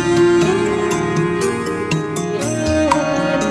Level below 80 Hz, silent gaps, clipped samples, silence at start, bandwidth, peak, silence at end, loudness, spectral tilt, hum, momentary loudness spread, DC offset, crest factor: -40 dBFS; none; under 0.1%; 0 s; 11 kHz; 0 dBFS; 0 s; -17 LUFS; -5.5 dB/octave; none; 7 LU; under 0.1%; 16 dB